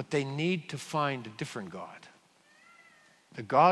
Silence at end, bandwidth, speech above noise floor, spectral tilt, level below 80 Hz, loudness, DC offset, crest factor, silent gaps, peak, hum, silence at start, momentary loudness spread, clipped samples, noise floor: 0 s; 12 kHz; 33 dB; -5.5 dB/octave; -78 dBFS; -32 LUFS; under 0.1%; 24 dB; none; -8 dBFS; none; 0 s; 17 LU; under 0.1%; -63 dBFS